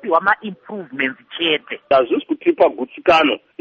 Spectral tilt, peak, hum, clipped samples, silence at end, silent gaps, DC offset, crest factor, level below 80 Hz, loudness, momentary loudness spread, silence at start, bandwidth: -5 dB/octave; -2 dBFS; none; under 0.1%; 0.25 s; none; under 0.1%; 16 dB; -58 dBFS; -17 LUFS; 8 LU; 0.05 s; 7.2 kHz